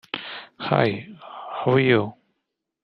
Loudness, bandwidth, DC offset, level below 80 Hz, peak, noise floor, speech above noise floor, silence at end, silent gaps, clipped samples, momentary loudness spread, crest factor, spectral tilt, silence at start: -22 LUFS; 6 kHz; under 0.1%; -66 dBFS; -2 dBFS; -80 dBFS; 59 dB; 0.7 s; none; under 0.1%; 18 LU; 22 dB; -8.5 dB/octave; 0.15 s